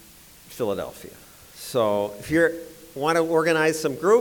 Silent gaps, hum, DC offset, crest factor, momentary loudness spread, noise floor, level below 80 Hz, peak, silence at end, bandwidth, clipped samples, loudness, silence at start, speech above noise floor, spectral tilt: none; none; under 0.1%; 16 dB; 18 LU; -49 dBFS; -56 dBFS; -8 dBFS; 0 s; over 20 kHz; under 0.1%; -23 LUFS; 0.5 s; 26 dB; -4.5 dB/octave